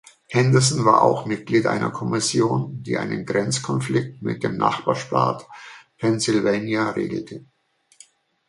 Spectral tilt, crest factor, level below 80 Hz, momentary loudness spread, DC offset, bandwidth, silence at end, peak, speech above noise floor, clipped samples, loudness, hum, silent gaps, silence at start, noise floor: -5 dB/octave; 20 dB; -60 dBFS; 12 LU; under 0.1%; 11.5 kHz; 1.1 s; -2 dBFS; 32 dB; under 0.1%; -21 LUFS; none; none; 0.3 s; -53 dBFS